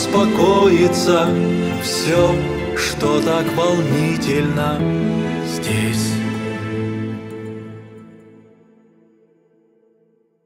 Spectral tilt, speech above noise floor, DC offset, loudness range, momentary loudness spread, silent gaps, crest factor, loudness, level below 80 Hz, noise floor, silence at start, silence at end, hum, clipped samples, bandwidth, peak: -5.5 dB/octave; 43 dB; under 0.1%; 14 LU; 12 LU; none; 16 dB; -18 LUFS; -42 dBFS; -59 dBFS; 0 s; 2.3 s; none; under 0.1%; 16 kHz; -2 dBFS